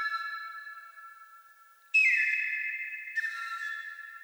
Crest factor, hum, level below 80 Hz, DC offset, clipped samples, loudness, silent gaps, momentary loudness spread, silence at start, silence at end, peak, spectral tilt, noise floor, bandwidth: 18 dB; 50 Hz at -100 dBFS; under -90 dBFS; under 0.1%; under 0.1%; -29 LUFS; none; 23 LU; 0 s; 0 s; -16 dBFS; 5.5 dB/octave; -58 dBFS; over 20 kHz